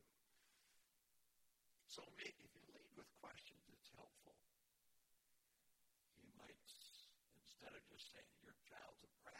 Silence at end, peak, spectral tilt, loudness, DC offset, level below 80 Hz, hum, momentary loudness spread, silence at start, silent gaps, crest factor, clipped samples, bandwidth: 0 s; -40 dBFS; -2 dB/octave; -62 LUFS; under 0.1%; -90 dBFS; none; 12 LU; 0 s; none; 26 dB; under 0.1%; 16.5 kHz